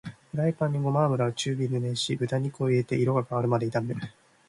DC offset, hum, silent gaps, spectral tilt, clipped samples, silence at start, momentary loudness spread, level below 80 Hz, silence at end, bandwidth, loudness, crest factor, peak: under 0.1%; none; none; -6.5 dB/octave; under 0.1%; 0.05 s; 6 LU; -64 dBFS; 0.4 s; 11.5 kHz; -27 LUFS; 16 dB; -10 dBFS